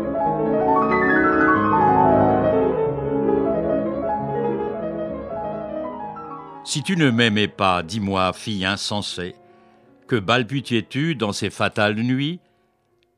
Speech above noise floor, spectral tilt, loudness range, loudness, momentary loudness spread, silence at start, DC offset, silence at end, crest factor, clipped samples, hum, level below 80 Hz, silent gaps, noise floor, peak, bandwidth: 43 dB; -5.5 dB/octave; 6 LU; -21 LUFS; 12 LU; 0 s; under 0.1%; 0.8 s; 18 dB; under 0.1%; none; -48 dBFS; none; -64 dBFS; -2 dBFS; 13.5 kHz